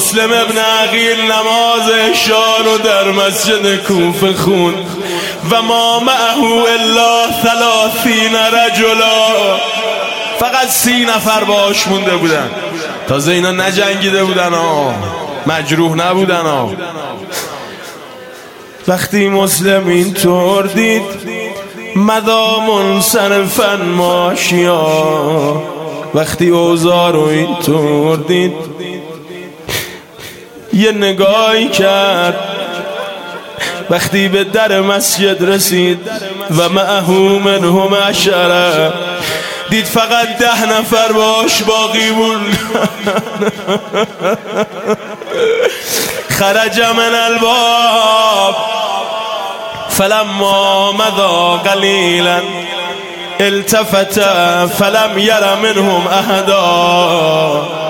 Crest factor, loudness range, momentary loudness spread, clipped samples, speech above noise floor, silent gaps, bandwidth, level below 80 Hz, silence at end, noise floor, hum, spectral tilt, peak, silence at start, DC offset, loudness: 12 dB; 5 LU; 11 LU; under 0.1%; 21 dB; none; 17 kHz; -50 dBFS; 0 s; -32 dBFS; none; -3.5 dB/octave; 0 dBFS; 0 s; under 0.1%; -11 LUFS